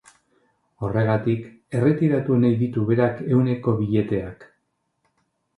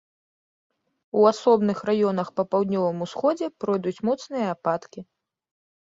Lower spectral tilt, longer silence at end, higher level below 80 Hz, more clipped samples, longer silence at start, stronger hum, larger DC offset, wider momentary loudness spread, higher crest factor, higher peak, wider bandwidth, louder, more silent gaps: first, -10 dB/octave vs -7 dB/octave; first, 1.15 s vs 0.8 s; first, -52 dBFS vs -70 dBFS; neither; second, 0.8 s vs 1.15 s; neither; neither; about the same, 9 LU vs 8 LU; about the same, 18 dB vs 20 dB; about the same, -6 dBFS vs -6 dBFS; first, 10.5 kHz vs 7.8 kHz; about the same, -22 LUFS vs -24 LUFS; neither